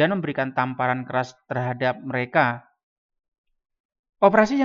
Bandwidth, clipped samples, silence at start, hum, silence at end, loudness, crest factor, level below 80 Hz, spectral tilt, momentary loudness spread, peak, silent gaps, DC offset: 7.4 kHz; under 0.1%; 0 s; none; 0 s; -23 LUFS; 22 dB; -66 dBFS; -7 dB/octave; 10 LU; -2 dBFS; 2.83-3.09 s, 3.28-3.32 s, 3.38-3.44 s, 3.80-3.89 s, 3.99-4.04 s; under 0.1%